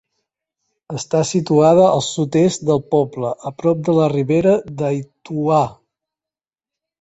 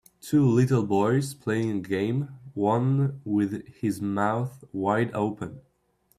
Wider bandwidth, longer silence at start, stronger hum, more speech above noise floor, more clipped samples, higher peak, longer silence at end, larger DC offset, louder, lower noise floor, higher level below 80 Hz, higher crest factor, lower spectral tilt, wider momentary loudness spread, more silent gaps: second, 8.2 kHz vs 15 kHz; first, 0.9 s vs 0.25 s; neither; first, over 74 dB vs 43 dB; neither; first, -2 dBFS vs -10 dBFS; first, 1.3 s vs 0.6 s; neither; first, -17 LUFS vs -26 LUFS; first, under -90 dBFS vs -68 dBFS; first, -56 dBFS vs -62 dBFS; about the same, 16 dB vs 16 dB; about the same, -6.5 dB/octave vs -7.5 dB/octave; first, 12 LU vs 9 LU; neither